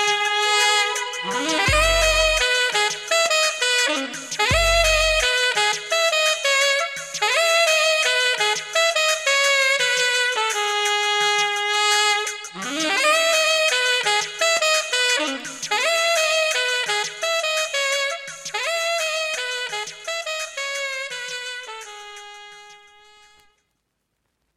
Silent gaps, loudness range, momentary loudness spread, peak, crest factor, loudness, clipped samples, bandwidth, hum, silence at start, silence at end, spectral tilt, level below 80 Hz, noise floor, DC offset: none; 10 LU; 11 LU; -6 dBFS; 16 dB; -19 LUFS; under 0.1%; 17 kHz; none; 0 s; 1.8 s; -0.5 dB/octave; -40 dBFS; -74 dBFS; under 0.1%